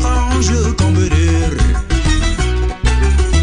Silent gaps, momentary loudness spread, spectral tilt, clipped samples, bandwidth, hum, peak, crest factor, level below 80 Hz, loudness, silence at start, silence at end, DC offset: none; 3 LU; -5.5 dB/octave; under 0.1%; 10.5 kHz; none; 0 dBFS; 12 dB; -16 dBFS; -15 LUFS; 0 s; 0 s; 0.8%